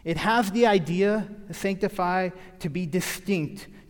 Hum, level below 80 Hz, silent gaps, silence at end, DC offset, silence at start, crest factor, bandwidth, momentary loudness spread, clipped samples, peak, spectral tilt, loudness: none; -52 dBFS; none; 0.1 s; under 0.1%; 0.05 s; 18 dB; 18 kHz; 12 LU; under 0.1%; -8 dBFS; -5.5 dB/octave; -25 LUFS